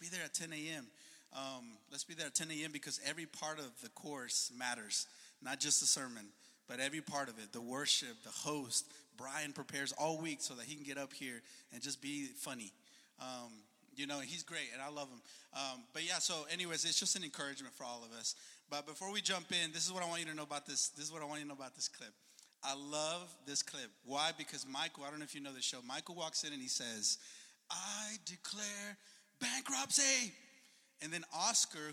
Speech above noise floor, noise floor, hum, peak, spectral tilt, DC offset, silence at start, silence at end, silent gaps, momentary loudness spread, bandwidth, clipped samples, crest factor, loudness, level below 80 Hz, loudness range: 25 dB; -67 dBFS; none; -18 dBFS; -1 dB/octave; under 0.1%; 0 s; 0 s; none; 15 LU; 16 kHz; under 0.1%; 24 dB; -40 LUFS; under -90 dBFS; 7 LU